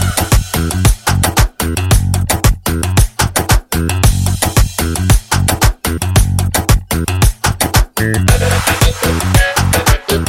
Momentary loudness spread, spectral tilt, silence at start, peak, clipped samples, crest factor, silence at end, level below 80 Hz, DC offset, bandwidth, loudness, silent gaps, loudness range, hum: 3 LU; -4 dB/octave; 0 s; 0 dBFS; under 0.1%; 12 dB; 0 s; -18 dBFS; under 0.1%; 17 kHz; -13 LUFS; none; 1 LU; none